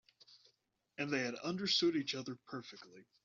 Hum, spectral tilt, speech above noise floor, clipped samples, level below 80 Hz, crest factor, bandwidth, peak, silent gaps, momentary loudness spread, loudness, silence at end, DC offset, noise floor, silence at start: none; -2.5 dB/octave; 41 dB; under 0.1%; -82 dBFS; 20 dB; 7.4 kHz; -22 dBFS; none; 21 LU; -37 LUFS; 0.25 s; under 0.1%; -79 dBFS; 0.3 s